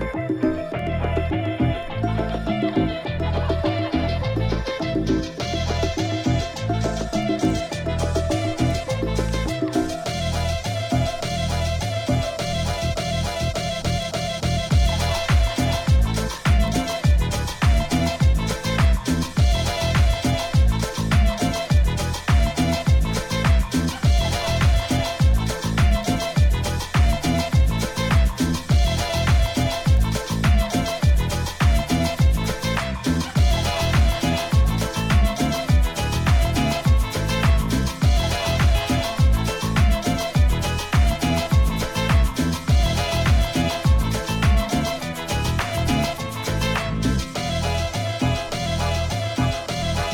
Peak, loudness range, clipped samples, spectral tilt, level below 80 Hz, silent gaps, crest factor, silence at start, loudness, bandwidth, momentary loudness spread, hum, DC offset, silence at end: -6 dBFS; 3 LU; under 0.1%; -5.5 dB/octave; -24 dBFS; none; 14 dB; 0 s; -22 LUFS; 18 kHz; 5 LU; none; under 0.1%; 0 s